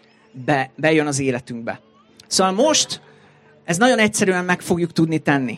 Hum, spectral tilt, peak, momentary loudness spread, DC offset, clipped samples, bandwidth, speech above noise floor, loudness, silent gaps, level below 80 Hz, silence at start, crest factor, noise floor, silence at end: none; -4 dB/octave; -2 dBFS; 14 LU; under 0.1%; under 0.1%; 15.5 kHz; 32 dB; -19 LUFS; none; -60 dBFS; 0.35 s; 18 dB; -51 dBFS; 0 s